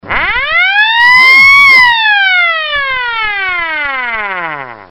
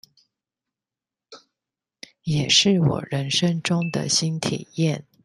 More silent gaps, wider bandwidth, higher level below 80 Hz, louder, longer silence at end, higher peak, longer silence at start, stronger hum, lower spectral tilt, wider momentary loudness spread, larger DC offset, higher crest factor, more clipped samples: neither; first, 18 kHz vs 12 kHz; first, -38 dBFS vs -58 dBFS; first, -6 LUFS vs -21 LUFS; second, 0.05 s vs 0.25 s; about the same, 0 dBFS vs -2 dBFS; second, 0.05 s vs 1.3 s; neither; second, -1 dB/octave vs -4 dB/octave; first, 14 LU vs 10 LU; neither; second, 8 dB vs 22 dB; first, 1% vs under 0.1%